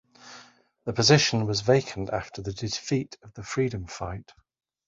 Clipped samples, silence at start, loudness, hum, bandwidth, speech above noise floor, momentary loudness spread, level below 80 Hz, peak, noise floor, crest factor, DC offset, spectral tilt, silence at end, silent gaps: under 0.1%; 0.25 s; -26 LUFS; none; 7.8 kHz; 28 dB; 22 LU; -52 dBFS; -4 dBFS; -54 dBFS; 24 dB; under 0.1%; -4.5 dB/octave; 0.65 s; none